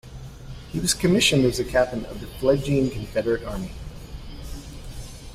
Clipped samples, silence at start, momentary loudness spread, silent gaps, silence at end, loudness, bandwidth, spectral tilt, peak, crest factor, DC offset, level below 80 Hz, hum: under 0.1%; 0.05 s; 22 LU; none; 0 s; -23 LUFS; 16 kHz; -4.5 dB/octave; -4 dBFS; 20 dB; under 0.1%; -40 dBFS; none